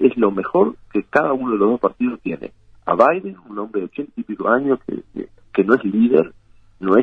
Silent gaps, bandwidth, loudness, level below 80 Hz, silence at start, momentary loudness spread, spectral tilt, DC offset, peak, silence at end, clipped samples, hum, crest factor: none; 6.2 kHz; -19 LUFS; -56 dBFS; 0 s; 14 LU; -9 dB/octave; under 0.1%; 0 dBFS; 0 s; under 0.1%; none; 18 dB